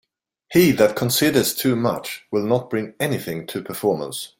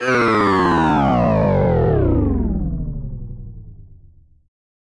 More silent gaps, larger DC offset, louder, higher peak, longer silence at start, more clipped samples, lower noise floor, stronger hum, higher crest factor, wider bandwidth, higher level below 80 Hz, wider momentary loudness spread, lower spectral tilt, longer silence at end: neither; neither; second, -20 LUFS vs -17 LUFS; about the same, -2 dBFS vs -4 dBFS; first, 0.5 s vs 0 s; neither; about the same, -49 dBFS vs -48 dBFS; neither; first, 20 dB vs 14 dB; first, 17 kHz vs 11 kHz; second, -56 dBFS vs -28 dBFS; second, 11 LU vs 18 LU; second, -4.5 dB/octave vs -8 dB/octave; second, 0.15 s vs 0.9 s